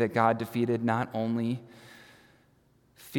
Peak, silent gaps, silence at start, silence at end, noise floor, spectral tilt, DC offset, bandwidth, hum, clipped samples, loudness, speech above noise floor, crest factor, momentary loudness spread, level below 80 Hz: -10 dBFS; none; 0 s; 0 s; -65 dBFS; -7.5 dB/octave; under 0.1%; 18 kHz; none; under 0.1%; -29 LUFS; 36 dB; 22 dB; 24 LU; -74 dBFS